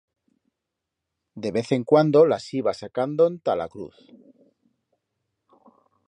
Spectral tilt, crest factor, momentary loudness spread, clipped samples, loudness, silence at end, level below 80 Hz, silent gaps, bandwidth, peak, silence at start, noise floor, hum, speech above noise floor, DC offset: -7 dB/octave; 20 dB; 16 LU; under 0.1%; -22 LUFS; 2.2 s; -66 dBFS; none; 9.6 kHz; -4 dBFS; 1.35 s; -84 dBFS; none; 62 dB; under 0.1%